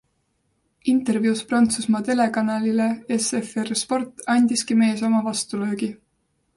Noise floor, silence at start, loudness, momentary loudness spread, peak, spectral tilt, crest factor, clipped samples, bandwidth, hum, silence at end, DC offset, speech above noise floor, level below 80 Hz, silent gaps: -70 dBFS; 0.85 s; -22 LUFS; 7 LU; -8 dBFS; -4 dB/octave; 14 dB; under 0.1%; 11.5 kHz; none; 0.6 s; under 0.1%; 49 dB; -64 dBFS; none